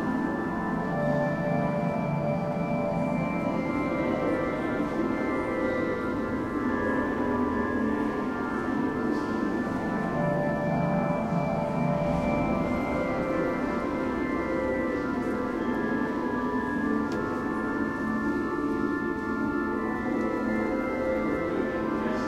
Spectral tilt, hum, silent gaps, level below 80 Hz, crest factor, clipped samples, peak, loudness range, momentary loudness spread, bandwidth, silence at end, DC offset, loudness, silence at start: -8 dB/octave; none; none; -48 dBFS; 12 dB; under 0.1%; -14 dBFS; 1 LU; 2 LU; 13.5 kHz; 0 s; under 0.1%; -28 LUFS; 0 s